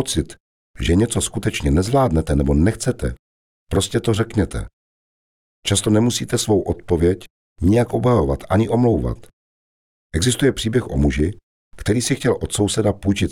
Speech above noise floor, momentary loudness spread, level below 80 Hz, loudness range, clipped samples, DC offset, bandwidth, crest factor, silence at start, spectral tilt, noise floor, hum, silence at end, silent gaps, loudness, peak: over 72 dB; 9 LU; -32 dBFS; 3 LU; under 0.1%; 0.3%; 16.5 kHz; 16 dB; 0 s; -5.5 dB/octave; under -90 dBFS; none; 0 s; 0.40-0.74 s, 3.19-3.67 s, 4.73-5.63 s, 7.30-7.56 s, 9.33-10.10 s, 11.43-11.71 s; -19 LUFS; -4 dBFS